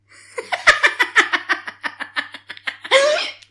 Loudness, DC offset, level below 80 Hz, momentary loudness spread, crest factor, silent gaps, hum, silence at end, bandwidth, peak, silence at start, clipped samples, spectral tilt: -17 LUFS; under 0.1%; -56 dBFS; 15 LU; 18 dB; none; none; 0.15 s; 12 kHz; -2 dBFS; 0.35 s; under 0.1%; 0 dB/octave